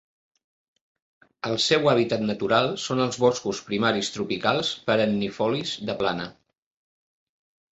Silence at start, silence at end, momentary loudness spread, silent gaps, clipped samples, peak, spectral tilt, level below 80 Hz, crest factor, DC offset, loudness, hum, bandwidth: 1.45 s; 1.4 s; 8 LU; none; under 0.1%; -4 dBFS; -4.5 dB/octave; -62 dBFS; 22 dB; under 0.1%; -24 LUFS; none; 8.2 kHz